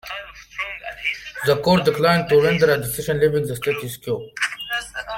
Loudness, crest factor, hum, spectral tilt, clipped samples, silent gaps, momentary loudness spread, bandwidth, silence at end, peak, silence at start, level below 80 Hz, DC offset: -20 LUFS; 18 dB; none; -5 dB/octave; under 0.1%; none; 12 LU; 17 kHz; 0 s; -4 dBFS; 0.05 s; -50 dBFS; under 0.1%